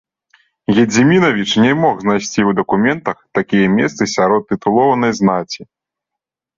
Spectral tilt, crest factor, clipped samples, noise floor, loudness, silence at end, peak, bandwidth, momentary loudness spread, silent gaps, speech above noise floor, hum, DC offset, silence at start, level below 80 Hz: -5.5 dB/octave; 14 dB; under 0.1%; -83 dBFS; -14 LUFS; 0.95 s; 0 dBFS; 7.6 kHz; 9 LU; none; 69 dB; none; under 0.1%; 0.7 s; -52 dBFS